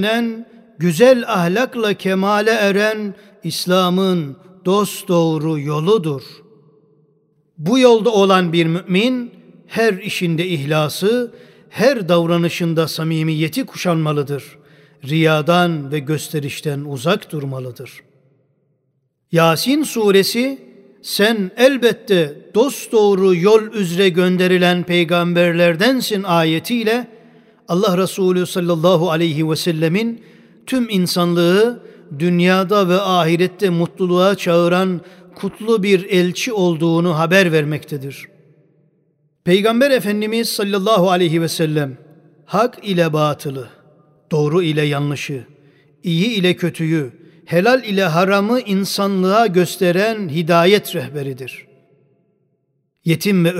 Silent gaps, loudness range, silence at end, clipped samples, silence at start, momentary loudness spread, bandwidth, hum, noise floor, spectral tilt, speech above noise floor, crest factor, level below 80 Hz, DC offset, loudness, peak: none; 5 LU; 0 s; under 0.1%; 0 s; 12 LU; 16 kHz; none; -67 dBFS; -5.5 dB/octave; 51 dB; 16 dB; -66 dBFS; under 0.1%; -16 LUFS; 0 dBFS